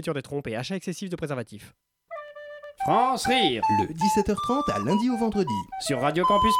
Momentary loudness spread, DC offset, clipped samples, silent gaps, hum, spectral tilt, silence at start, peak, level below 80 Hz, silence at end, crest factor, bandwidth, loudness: 18 LU; under 0.1%; under 0.1%; none; none; -5 dB/octave; 0 s; -8 dBFS; -50 dBFS; 0 s; 16 dB; 17 kHz; -25 LUFS